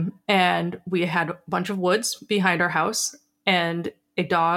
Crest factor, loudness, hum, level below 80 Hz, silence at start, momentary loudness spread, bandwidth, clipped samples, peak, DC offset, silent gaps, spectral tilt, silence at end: 20 dB; -23 LUFS; none; -66 dBFS; 0 s; 7 LU; 17 kHz; under 0.1%; -4 dBFS; under 0.1%; none; -4 dB/octave; 0 s